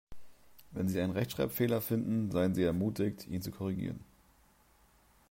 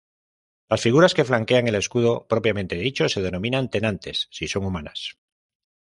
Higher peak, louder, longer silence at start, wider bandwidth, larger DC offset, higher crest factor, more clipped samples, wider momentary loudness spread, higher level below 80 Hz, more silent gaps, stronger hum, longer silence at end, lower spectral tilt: second, -18 dBFS vs -4 dBFS; second, -34 LUFS vs -22 LUFS; second, 0.1 s vs 0.7 s; first, 16 kHz vs 11.5 kHz; neither; about the same, 16 dB vs 18 dB; neither; about the same, 9 LU vs 11 LU; about the same, -60 dBFS vs -56 dBFS; neither; neither; first, 1.25 s vs 0.8 s; first, -7 dB/octave vs -5 dB/octave